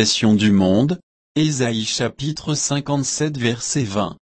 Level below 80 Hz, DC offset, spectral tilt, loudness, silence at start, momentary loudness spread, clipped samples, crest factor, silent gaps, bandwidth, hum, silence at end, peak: -52 dBFS; under 0.1%; -4.5 dB/octave; -19 LUFS; 0 s; 8 LU; under 0.1%; 16 dB; 1.03-1.35 s; 8.8 kHz; none; 0.2 s; -2 dBFS